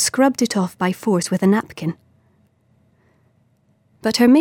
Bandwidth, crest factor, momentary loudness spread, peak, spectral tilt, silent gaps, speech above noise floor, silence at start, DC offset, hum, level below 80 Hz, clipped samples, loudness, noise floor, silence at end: 17 kHz; 16 dB; 11 LU; -4 dBFS; -4.5 dB/octave; none; 43 dB; 0 s; under 0.1%; none; -62 dBFS; under 0.1%; -19 LUFS; -60 dBFS; 0 s